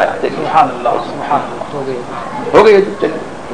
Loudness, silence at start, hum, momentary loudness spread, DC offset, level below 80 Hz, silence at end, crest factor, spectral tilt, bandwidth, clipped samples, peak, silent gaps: -13 LUFS; 0 s; none; 14 LU; 2%; -46 dBFS; 0 s; 14 dB; -5.5 dB/octave; 11 kHz; 0.9%; 0 dBFS; none